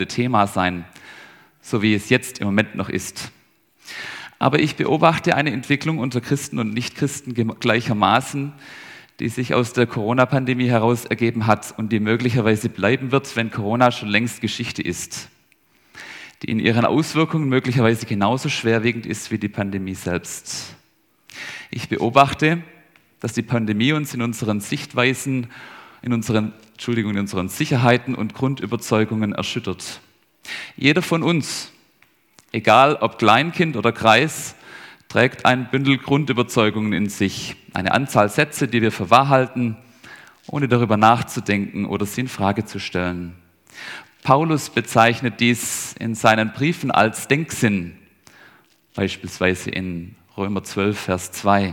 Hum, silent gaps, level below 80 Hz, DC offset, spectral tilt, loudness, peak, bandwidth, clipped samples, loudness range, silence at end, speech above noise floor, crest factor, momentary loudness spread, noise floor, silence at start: none; none; -58 dBFS; under 0.1%; -5 dB/octave; -20 LUFS; 0 dBFS; 18.5 kHz; under 0.1%; 5 LU; 0 s; 41 dB; 20 dB; 15 LU; -61 dBFS; 0 s